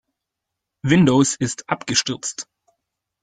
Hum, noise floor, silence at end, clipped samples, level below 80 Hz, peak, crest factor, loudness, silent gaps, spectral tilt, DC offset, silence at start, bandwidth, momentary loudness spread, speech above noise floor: none; -82 dBFS; 0.8 s; under 0.1%; -54 dBFS; -2 dBFS; 20 dB; -19 LUFS; none; -4.5 dB/octave; under 0.1%; 0.85 s; 9.6 kHz; 14 LU; 63 dB